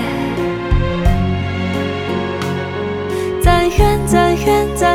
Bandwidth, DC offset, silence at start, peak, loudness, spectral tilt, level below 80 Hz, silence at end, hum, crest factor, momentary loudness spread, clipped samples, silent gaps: 18 kHz; under 0.1%; 0 s; 0 dBFS; -16 LUFS; -6 dB/octave; -22 dBFS; 0 s; none; 14 dB; 7 LU; under 0.1%; none